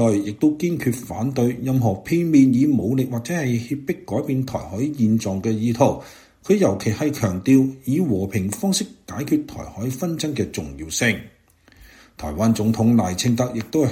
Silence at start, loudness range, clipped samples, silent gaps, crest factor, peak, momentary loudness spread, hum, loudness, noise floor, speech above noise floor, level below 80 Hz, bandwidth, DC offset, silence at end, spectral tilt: 0 s; 4 LU; under 0.1%; none; 20 dB; -2 dBFS; 10 LU; none; -21 LUFS; -52 dBFS; 31 dB; -48 dBFS; 16.5 kHz; under 0.1%; 0 s; -6 dB/octave